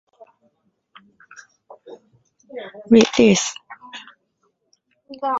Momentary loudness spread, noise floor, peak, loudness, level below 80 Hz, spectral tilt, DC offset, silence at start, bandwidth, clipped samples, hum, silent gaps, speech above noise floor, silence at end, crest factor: 24 LU; -69 dBFS; 0 dBFS; -16 LUFS; -58 dBFS; -4 dB/octave; under 0.1%; 1.85 s; 8 kHz; under 0.1%; none; none; 53 dB; 0 s; 22 dB